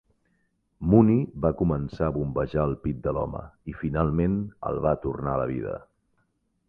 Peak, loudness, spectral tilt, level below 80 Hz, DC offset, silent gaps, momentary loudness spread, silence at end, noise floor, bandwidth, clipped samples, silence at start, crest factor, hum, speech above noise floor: -4 dBFS; -26 LUFS; -11.5 dB/octave; -42 dBFS; under 0.1%; none; 13 LU; 0.85 s; -72 dBFS; 5 kHz; under 0.1%; 0.8 s; 22 dB; none; 47 dB